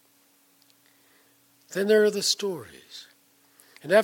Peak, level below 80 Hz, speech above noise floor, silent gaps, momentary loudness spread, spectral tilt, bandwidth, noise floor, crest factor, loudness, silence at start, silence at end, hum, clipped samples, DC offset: -8 dBFS; -78 dBFS; 38 dB; none; 23 LU; -3 dB/octave; 17.5 kHz; -62 dBFS; 20 dB; -24 LUFS; 1.7 s; 0 s; 60 Hz at -60 dBFS; under 0.1%; under 0.1%